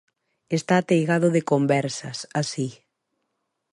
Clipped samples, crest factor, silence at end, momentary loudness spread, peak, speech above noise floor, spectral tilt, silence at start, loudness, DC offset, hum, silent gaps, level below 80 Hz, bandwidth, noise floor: under 0.1%; 18 dB; 1 s; 10 LU; -6 dBFS; 55 dB; -5.5 dB/octave; 0.5 s; -23 LUFS; under 0.1%; none; none; -70 dBFS; 11.5 kHz; -77 dBFS